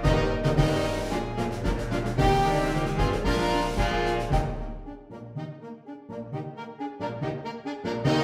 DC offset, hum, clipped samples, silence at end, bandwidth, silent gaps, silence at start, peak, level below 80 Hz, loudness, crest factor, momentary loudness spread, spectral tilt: under 0.1%; none; under 0.1%; 0 s; 15 kHz; none; 0 s; -8 dBFS; -34 dBFS; -27 LUFS; 18 dB; 16 LU; -6 dB/octave